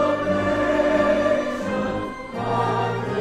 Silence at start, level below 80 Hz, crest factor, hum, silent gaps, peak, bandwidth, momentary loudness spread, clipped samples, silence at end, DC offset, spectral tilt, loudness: 0 s; -44 dBFS; 14 dB; none; none; -8 dBFS; 11.5 kHz; 8 LU; under 0.1%; 0 s; under 0.1%; -6.5 dB/octave; -22 LUFS